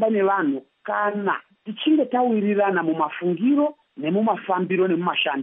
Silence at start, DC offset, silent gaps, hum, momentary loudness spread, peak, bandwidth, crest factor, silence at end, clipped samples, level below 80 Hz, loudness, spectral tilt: 0 s; under 0.1%; none; none; 7 LU; -8 dBFS; 3.9 kHz; 14 dB; 0 s; under 0.1%; -82 dBFS; -22 LUFS; -4 dB/octave